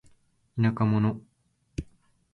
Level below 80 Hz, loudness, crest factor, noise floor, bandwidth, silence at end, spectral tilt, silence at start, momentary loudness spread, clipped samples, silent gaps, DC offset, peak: -50 dBFS; -26 LUFS; 18 dB; -69 dBFS; 6.8 kHz; 0.5 s; -9 dB/octave; 0.55 s; 17 LU; under 0.1%; none; under 0.1%; -12 dBFS